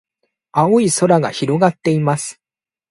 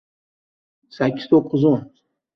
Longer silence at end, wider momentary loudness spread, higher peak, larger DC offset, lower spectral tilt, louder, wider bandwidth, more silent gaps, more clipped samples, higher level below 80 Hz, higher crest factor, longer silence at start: about the same, 0.6 s vs 0.5 s; about the same, 9 LU vs 7 LU; first, 0 dBFS vs -4 dBFS; neither; second, -5.5 dB/octave vs -9 dB/octave; first, -16 LUFS vs -19 LUFS; first, 11.5 kHz vs 6.2 kHz; neither; neither; about the same, -58 dBFS vs -62 dBFS; about the same, 16 dB vs 18 dB; second, 0.55 s vs 1 s